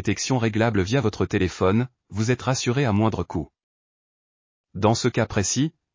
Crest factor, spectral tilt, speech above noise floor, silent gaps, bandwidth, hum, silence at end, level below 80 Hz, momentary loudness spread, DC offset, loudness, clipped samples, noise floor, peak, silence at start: 18 dB; -5.5 dB/octave; over 68 dB; 3.63-4.64 s; 7.6 kHz; none; 0.25 s; -44 dBFS; 8 LU; under 0.1%; -23 LUFS; under 0.1%; under -90 dBFS; -6 dBFS; 0 s